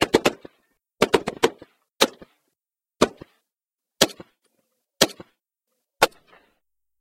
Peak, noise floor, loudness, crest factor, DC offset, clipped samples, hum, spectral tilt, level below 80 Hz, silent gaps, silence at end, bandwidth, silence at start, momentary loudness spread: 0 dBFS; -88 dBFS; -23 LUFS; 26 dB; under 0.1%; under 0.1%; none; -2.5 dB/octave; -54 dBFS; none; 0.95 s; 16 kHz; 0 s; 3 LU